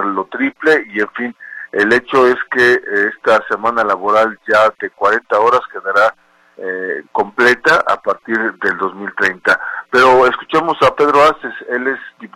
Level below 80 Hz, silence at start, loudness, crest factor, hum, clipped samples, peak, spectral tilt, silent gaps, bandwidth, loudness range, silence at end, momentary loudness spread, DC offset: -54 dBFS; 0 s; -14 LUFS; 14 dB; none; under 0.1%; 0 dBFS; -4.5 dB/octave; none; 15 kHz; 2 LU; 0.1 s; 10 LU; under 0.1%